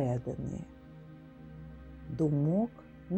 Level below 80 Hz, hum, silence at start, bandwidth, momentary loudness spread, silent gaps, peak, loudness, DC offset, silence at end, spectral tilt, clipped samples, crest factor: -56 dBFS; none; 0 s; 8.4 kHz; 22 LU; none; -18 dBFS; -33 LUFS; under 0.1%; 0 s; -10 dB/octave; under 0.1%; 16 dB